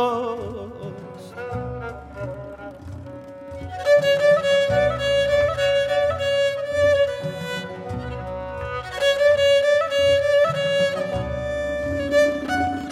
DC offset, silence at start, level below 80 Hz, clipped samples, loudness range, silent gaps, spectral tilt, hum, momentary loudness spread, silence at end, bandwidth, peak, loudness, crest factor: under 0.1%; 0 s; -44 dBFS; under 0.1%; 8 LU; none; -4.5 dB/octave; none; 18 LU; 0 s; 13.5 kHz; -8 dBFS; -21 LUFS; 14 dB